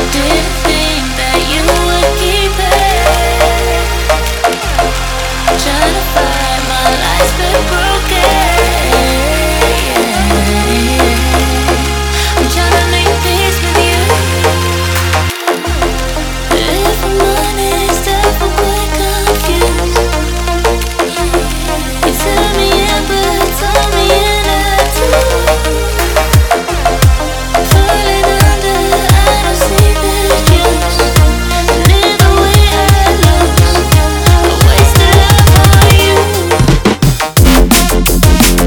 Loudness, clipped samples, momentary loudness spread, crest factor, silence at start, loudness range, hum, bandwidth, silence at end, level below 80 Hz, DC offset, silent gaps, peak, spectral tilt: -10 LUFS; 0.6%; 6 LU; 10 dB; 0 s; 5 LU; none; over 20 kHz; 0 s; -14 dBFS; under 0.1%; none; 0 dBFS; -4 dB/octave